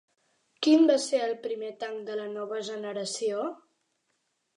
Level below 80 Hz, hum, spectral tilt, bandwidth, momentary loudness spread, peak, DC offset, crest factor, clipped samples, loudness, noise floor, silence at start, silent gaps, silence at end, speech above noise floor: -88 dBFS; none; -3.5 dB/octave; 11 kHz; 14 LU; -10 dBFS; under 0.1%; 18 dB; under 0.1%; -28 LUFS; -77 dBFS; 0.6 s; none; 1 s; 49 dB